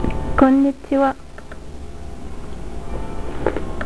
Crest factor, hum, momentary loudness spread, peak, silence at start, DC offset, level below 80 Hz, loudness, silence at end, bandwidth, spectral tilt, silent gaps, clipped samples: 18 dB; none; 22 LU; -2 dBFS; 0 s; 3%; -32 dBFS; -19 LUFS; 0 s; 11 kHz; -7.5 dB/octave; none; under 0.1%